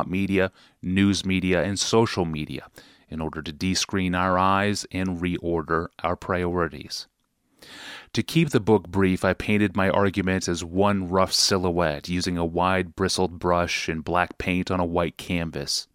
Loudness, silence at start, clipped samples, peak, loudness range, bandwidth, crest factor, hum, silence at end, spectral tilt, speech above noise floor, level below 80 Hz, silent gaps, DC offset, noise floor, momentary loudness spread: -24 LUFS; 0 s; under 0.1%; -4 dBFS; 4 LU; 16 kHz; 20 dB; none; 0.1 s; -4.5 dB/octave; 43 dB; -48 dBFS; none; under 0.1%; -67 dBFS; 10 LU